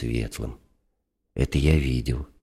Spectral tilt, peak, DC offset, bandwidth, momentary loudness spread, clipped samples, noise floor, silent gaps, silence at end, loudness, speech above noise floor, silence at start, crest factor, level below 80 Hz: -6.5 dB/octave; -6 dBFS; under 0.1%; 14 kHz; 15 LU; under 0.1%; -74 dBFS; none; 0.2 s; -25 LUFS; 50 dB; 0 s; 20 dB; -32 dBFS